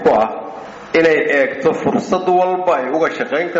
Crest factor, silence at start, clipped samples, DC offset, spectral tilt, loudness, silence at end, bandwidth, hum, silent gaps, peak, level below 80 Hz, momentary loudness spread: 12 dB; 0 s; under 0.1%; under 0.1%; -3.5 dB/octave; -16 LUFS; 0 s; 8 kHz; none; none; -4 dBFS; -54 dBFS; 8 LU